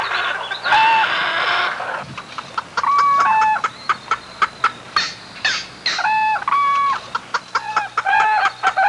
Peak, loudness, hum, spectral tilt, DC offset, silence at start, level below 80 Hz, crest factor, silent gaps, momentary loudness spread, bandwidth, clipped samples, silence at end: -6 dBFS; -18 LUFS; none; -1 dB/octave; under 0.1%; 0 s; -60 dBFS; 14 dB; none; 10 LU; 11.5 kHz; under 0.1%; 0 s